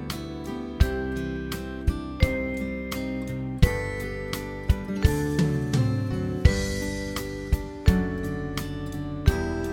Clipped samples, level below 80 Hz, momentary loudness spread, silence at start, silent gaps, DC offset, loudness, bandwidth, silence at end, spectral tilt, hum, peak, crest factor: under 0.1%; -30 dBFS; 8 LU; 0 s; none; under 0.1%; -27 LUFS; 17.5 kHz; 0 s; -6.5 dB/octave; none; -4 dBFS; 22 dB